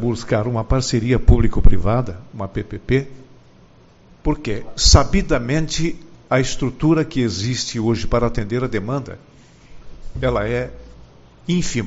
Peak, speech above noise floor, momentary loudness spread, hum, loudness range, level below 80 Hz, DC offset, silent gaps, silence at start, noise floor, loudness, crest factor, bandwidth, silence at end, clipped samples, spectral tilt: 0 dBFS; 31 dB; 12 LU; none; 6 LU; -24 dBFS; under 0.1%; none; 0 s; -48 dBFS; -20 LUFS; 18 dB; 8 kHz; 0 s; under 0.1%; -5.5 dB/octave